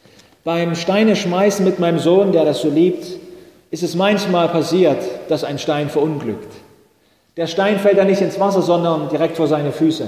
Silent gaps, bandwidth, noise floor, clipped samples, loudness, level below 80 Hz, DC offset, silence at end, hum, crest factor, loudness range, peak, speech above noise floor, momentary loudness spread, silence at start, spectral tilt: none; 15.5 kHz; -57 dBFS; under 0.1%; -17 LUFS; -60 dBFS; under 0.1%; 0 s; none; 14 dB; 3 LU; -2 dBFS; 41 dB; 11 LU; 0.45 s; -6 dB/octave